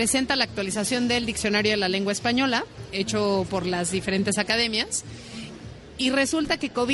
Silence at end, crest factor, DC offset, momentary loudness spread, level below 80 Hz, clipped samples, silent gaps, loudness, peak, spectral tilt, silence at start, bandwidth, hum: 0 s; 16 dB; under 0.1%; 13 LU; -50 dBFS; under 0.1%; none; -24 LUFS; -8 dBFS; -3 dB/octave; 0 s; 11.5 kHz; none